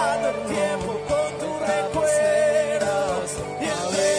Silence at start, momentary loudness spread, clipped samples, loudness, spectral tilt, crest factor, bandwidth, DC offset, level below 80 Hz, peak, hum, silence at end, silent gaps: 0 s; 7 LU; under 0.1%; -23 LUFS; -3.5 dB/octave; 14 dB; 11 kHz; under 0.1%; -50 dBFS; -10 dBFS; none; 0 s; none